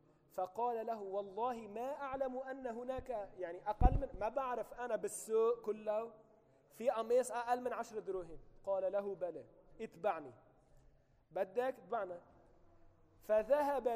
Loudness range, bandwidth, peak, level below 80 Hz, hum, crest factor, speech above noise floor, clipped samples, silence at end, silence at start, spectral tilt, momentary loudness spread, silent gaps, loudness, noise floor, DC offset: 5 LU; 15.5 kHz; -14 dBFS; -48 dBFS; none; 26 dB; 30 dB; under 0.1%; 0 s; 0.35 s; -6 dB/octave; 12 LU; none; -40 LUFS; -68 dBFS; under 0.1%